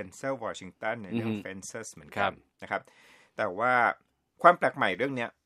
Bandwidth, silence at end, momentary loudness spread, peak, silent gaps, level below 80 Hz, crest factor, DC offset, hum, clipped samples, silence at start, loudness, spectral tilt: 13.5 kHz; 0.15 s; 17 LU; -4 dBFS; none; -72 dBFS; 26 dB; under 0.1%; none; under 0.1%; 0 s; -29 LUFS; -4.5 dB/octave